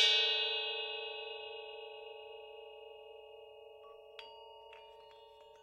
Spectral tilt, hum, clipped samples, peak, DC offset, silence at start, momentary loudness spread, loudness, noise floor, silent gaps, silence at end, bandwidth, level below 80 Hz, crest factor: 2.5 dB/octave; none; under 0.1%; -16 dBFS; under 0.1%; 0 s; 24 LU; -35 LUFS; -58 dBFS; none; 0 s; 15.5 kHz; -82 dBFS; 24 dB